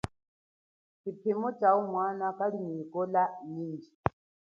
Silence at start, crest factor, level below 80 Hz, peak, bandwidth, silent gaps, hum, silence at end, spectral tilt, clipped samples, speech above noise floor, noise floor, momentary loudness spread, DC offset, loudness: 0.05 s; 26 dB; -60 dBFS; -6 dBFS; 11 kHz; 0.28-1.04 s, 3.95-4.04 s; none; 0.45 s; -8.5 dB/octave; under 0.1%; over 59 dB; under -90 dBFS; 14 LU; under 0.1%; -31 LUFS